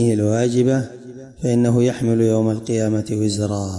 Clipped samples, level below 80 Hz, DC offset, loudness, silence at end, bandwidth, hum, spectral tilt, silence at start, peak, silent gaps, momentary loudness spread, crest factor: under 0.1%; -54 dBFS; under 0.1%; -19 LUFS; 0 s; 11.5 kHz; none; -7 dB/octave; 0 s; -6 dBFS; none; 8 LU; 12 dB